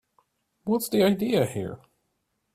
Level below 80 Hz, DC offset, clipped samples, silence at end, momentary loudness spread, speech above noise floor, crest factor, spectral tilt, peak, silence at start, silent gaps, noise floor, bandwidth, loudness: -62 dBFS; under 0.1%; under 0.1%; 0.8 s; 15 LU; 52 dB; 18 dB; -5.5 dB/octave; -10 dBFS; 0.65 s; none; -76 dBFS; 16 kHz; -25 LUFS